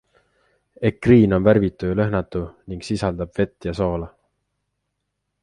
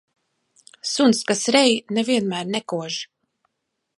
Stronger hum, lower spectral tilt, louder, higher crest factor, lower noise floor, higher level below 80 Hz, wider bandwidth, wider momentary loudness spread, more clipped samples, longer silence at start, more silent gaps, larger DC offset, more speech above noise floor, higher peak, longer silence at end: first, 50 Hz at -45 dBFS vs none; first, -8 dB/octave vs -3.5 dB/octave; about the same, -20 LUFS vs -21 LUFS; about the same, 20 dB vs 20 dB; about the same, -77 dBFS vs -78 dBFS; first, -40 dBFS vs -72 dBFS; about the same, 11 kHz vs 11.5 kHz; about the same, 15 LU vs 13 LU; neither; about the same, 0.8 s vs 0.85 s; neither; neither; about the same, 57 dB vs 58 dB; about the same, -2 dBFS vs -2 dBFS; first, 1.35 s vs 0.95 s